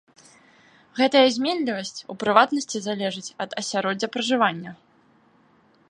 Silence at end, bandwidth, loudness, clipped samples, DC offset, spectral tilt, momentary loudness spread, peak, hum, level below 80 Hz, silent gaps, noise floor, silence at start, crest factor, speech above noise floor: 1.15 s; 11 kHz; -23 LUFS; under 0.1%; under 0.1%; -3.5 dB/octave; 14 LU; -2 dBFS; none; -72 dBFS; none; -59 dBFS; 0.95 s; 22 dB; 36 dB